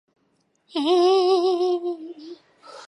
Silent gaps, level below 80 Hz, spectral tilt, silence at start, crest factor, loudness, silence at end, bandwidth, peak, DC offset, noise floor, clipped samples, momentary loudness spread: none; -82 dBFS; -3 dB/octave; 0.75 s; 14 dB; -21 LUFS; 0 s; 10.5 kHz; -8 dBFS; under 0.1%; -68 dBFS; under 0.1%; 21 LU